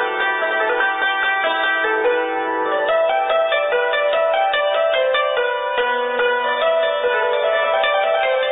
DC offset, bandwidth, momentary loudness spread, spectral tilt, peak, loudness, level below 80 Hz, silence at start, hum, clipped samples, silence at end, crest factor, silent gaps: under 0.1%; 4 kHz; 2 LU; -6.5 dB/octave; -8 dBFS; -18 LUFS; -64 dBFS; 0 s; none; under 0.1%; 0 s; 10 dB; none